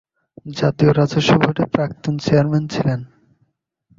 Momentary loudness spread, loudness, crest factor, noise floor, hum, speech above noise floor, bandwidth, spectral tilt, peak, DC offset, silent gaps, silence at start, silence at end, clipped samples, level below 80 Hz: 8 LU; -18 LUFS; 18 dB; -65 dBFS; none; 49 dB; 7.6 kHz; -7 dB/octave; -2 dBFS; under 0.1%; none; 0.45 s; 0.9 s; under 0.1%; -48 dBFS